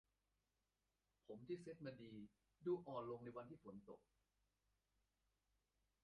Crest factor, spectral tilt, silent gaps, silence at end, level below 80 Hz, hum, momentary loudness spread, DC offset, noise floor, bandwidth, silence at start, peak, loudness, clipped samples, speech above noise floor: 20 dB; -7 dB/octave; none; 2.05 s; -86 dBFS; none; 15 LU; under 0.1%; under -90 dBFS; 5.6 kHz; 1.3 s; -36 dBFS; -53 LUFS; under 0.1%; over 37 dB